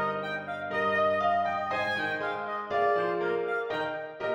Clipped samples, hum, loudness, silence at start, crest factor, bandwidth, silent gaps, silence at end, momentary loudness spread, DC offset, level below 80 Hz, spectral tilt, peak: under 0.1%; none; -29 LUFS; 0 s; 14 dB; 9.6 kHz; none; 0 s; 8 LU; under 0.1%; -70 dBFS; -5.5 dB/octave; -16 dBFS